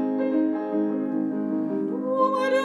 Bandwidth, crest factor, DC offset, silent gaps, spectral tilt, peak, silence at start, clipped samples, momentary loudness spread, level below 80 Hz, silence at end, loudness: 10 kHz; 14 dB; under 0.1%; none; -7 dB/octave; -10 dBFS; 0 s; under 0.1%; 4 LU; under -90 dBFS; 0 s; -25 LUFS